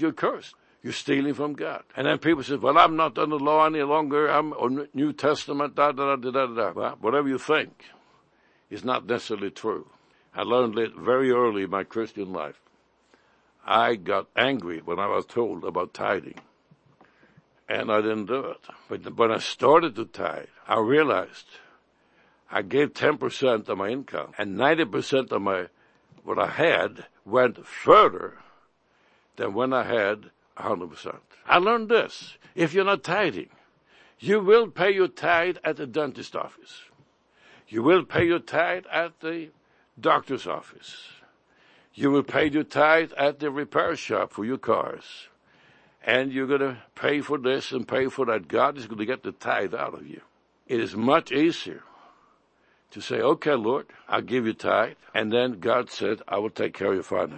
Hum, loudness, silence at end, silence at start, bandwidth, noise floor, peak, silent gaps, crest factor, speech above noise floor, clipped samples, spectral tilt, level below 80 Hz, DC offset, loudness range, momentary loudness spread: none; -25 LUFS; 0 s; 0 s; 8.8 kHz; -65 dBFS; -2 dBFS; none; 24 dB; 40 dB; under 0.1%; -5.5 dB/octave; -66 dBFS; under 0.1%; 5 LU; 14 LU